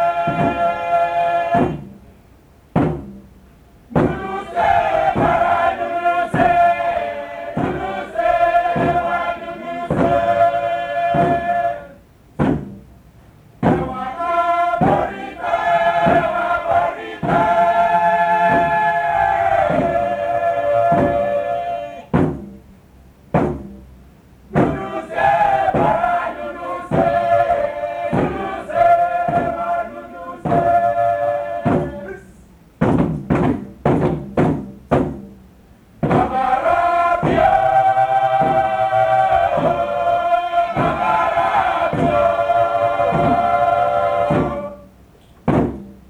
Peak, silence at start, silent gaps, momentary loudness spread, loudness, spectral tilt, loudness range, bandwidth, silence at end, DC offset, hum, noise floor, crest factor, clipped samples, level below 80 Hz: -2 dBFS; 0 s; none; 10 LU; -18 LUFS; -7.5 dB/octave; 5 LU; 10 kHz; 0.15 s; under 0.1%; none; -48 dBFS; 16 dB; under 0.1%; -40 dBFS